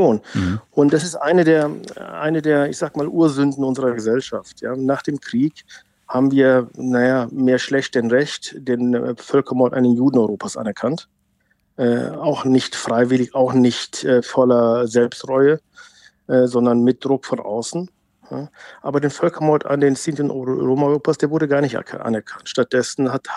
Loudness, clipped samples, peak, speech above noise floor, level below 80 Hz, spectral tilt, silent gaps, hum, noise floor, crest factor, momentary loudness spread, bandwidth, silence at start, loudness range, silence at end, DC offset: -18 LUFS; under 0.1%; -2 dBFS; 46 dB; -62 dBFS; -6 dB/octave; none; none; -64 dBFS; 16 dB; 9 LU; 11.5 kHz; 0 s; 4 LU; 0 s; under 0.1%